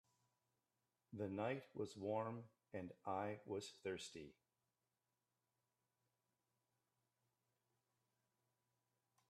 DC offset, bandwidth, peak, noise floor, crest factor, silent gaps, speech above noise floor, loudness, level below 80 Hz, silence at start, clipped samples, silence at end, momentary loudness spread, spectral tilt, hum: under 0.1%; 12.5 kHz; -30 dBFS; under -90 dBFS; 22 dB; none; over 42 dB; -49 LUFS; -90 dBFS; 1.1 s; under 0.1%; 5 s; 11 LU; -5.5 dB/octave; none